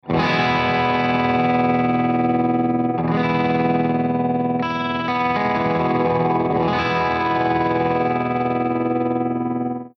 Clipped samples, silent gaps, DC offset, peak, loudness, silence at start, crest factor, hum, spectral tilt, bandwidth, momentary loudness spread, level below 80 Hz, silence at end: under 0.1%; none; under 0.1%; -8 dBFS; -20 LUFS; 0.05 s; 12 dB; none; -8 dB/octave; 6.4 kHz; 4 LU; -52 dBFS; 0.1 s